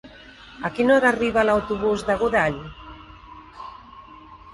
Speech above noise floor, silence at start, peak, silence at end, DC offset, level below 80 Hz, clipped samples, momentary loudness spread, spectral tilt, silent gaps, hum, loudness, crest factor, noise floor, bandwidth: 24 dB; 0.05 s; -6 dBFS; 0 s; under 0.1%; -48 dBFS; under 0.1%; 25 LU; -5.5 dB/octave; none; none; -21 LUFS; 18 dB; -45 dBFS; 11.5 kHz